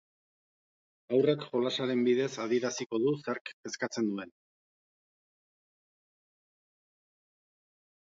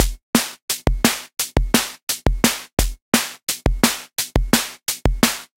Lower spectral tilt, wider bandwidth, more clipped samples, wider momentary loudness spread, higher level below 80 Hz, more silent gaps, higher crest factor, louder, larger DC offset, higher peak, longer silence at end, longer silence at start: first, -5 dB/octave vs -3 dB/octave; second, 7.8 kHz vs 17 kHz; neither; first, 10 LU vs 6 LU; second, -84 dBFS vs -26 dBFS; second, 3.41-3.45 s, 3.53-3.63 s vs 0.23-0.33 s, 0.62-0.68 s, 2.03-2.07 s, 2.73-2.77 s, 3.02-3.12 s, 3.43-3.47 s; about the same, 20 dB vs 20 dB; second, -31 LUFS vs -20 LUFS; neither; second, -14 dBFS vs 0 dBFS; first, 3.7 s vs 0.15 s; first, 1.1 s vs 0 s